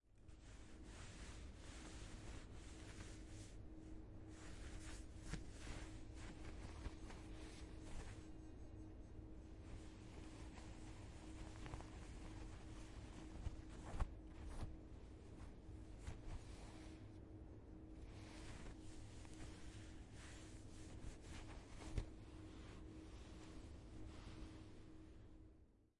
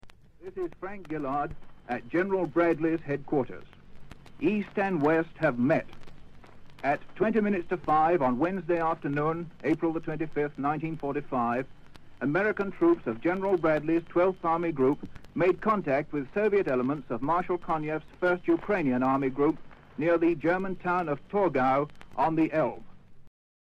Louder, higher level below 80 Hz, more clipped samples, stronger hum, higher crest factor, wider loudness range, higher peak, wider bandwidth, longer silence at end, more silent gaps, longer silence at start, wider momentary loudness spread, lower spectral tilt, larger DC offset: second, -57 LUFS vs -28 LUFS; about the same, -58 dBFS vs -54 dBFS; neither; neither; first, 26 dB vs 16 dB; about the same, 3 LU vs 3 LU; second, -28 dBFS vs -12 dBFS; first, 11.5 kHz vs 6.8 kHz; second, 0.15 s vs 0.35 s; neither; about the same, 0.05 s vs 0.05 s; second, 5 LU vs 10 LU; second, -5.5 dB/octave vs -8.5 dB/octave; neither